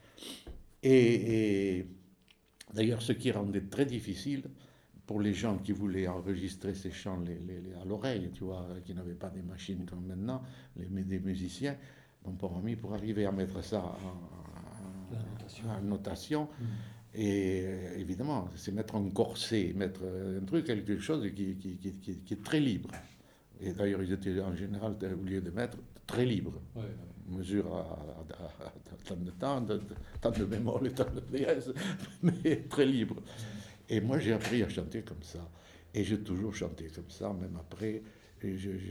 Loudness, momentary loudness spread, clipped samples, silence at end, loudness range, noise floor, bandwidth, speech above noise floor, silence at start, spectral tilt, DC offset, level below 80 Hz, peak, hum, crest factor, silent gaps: -35 LUFS; 15 LU; under 0.1%; 0 s; 7 LU; -65 dBFS; over 20 kHz; 31 dB; 0.05 s; -6.5 dB/octave; under 0.1%; -56 dBFS; -14 dBFS; none; 22 dB; none